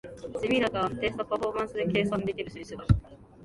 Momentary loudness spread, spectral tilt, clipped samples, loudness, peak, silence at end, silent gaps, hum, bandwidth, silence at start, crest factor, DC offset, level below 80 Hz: 11 LU; -7 dB/octave; under 0.1%; -29 LUFS; -8 dBFS; 0 s; none; none; 11.5 kHz; 0.05 s; 22 dB; under 0.1%; -40 dBFS